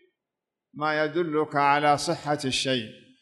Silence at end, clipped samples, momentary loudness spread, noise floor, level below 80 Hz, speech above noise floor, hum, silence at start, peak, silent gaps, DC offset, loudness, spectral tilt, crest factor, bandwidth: 0.25 s; under 0.1%; 8 LU; -87 dBFS; -64 dBFS; 62 dB; none; 0.75 s; -8 dBFS; none; under 0.1%; -25 LUFS; -4 dB/octave; 18 dB; 12 kHz